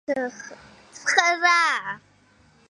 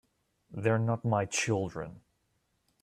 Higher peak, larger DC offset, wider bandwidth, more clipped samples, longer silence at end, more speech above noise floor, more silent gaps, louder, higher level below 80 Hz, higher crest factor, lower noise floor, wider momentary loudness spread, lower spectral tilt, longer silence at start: first, -2 dBFS vs -14 dBFS; neither; second, 11.5 kHz vs 13 kHz; neither; about the same, 0.75 s vs 0.85 s; second, 35 dB vs 46 dB; neither; first, -21 LUFS vs -31 LUFS; about the same, -70 dBFS vs -66 dBFS; about the same, 24 dB vs 20 dB; second, -58 dBFS vs -76 dBFS; first, 21 LU vs 14 LU; second, -0.5 dB/octave vs -5 dB/octave; second, 0.1 s vs 0.5 s